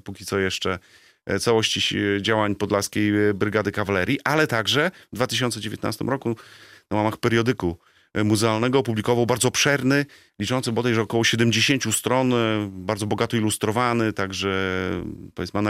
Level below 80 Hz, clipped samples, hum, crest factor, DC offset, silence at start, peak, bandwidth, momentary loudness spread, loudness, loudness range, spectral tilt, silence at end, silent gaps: -58 dBFS; under 0.1%; none; 18 dB; under 0.1%; 0.05 s; -6 dBFS; 16 kHz; 9 LU; -22 LUFS; 3 LU; -4.5 dB/octave; 0 s; none